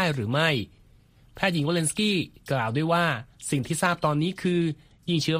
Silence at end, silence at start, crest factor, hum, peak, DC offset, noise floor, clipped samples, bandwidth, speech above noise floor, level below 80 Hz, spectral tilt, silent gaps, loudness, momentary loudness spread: 0 s; 0 s; 20 dB; none; -6 dBFS; under 0.1%; -56 dBFS; under 0.1%; 15.5 kHz; 31 dB; -58 dBFS; -5 dB/octave; none; -26 LUFS; 6 LU